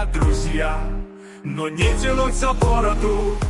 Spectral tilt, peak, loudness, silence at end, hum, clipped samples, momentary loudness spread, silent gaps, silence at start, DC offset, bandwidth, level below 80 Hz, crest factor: -5.5 dB/octave; -6 dBFS; -21 LUFS; 0 s; none; under 0.1%; 12 LU; none; 0 s; under 0.1%; 11.5 kHz; -22 dBFS; 14 dB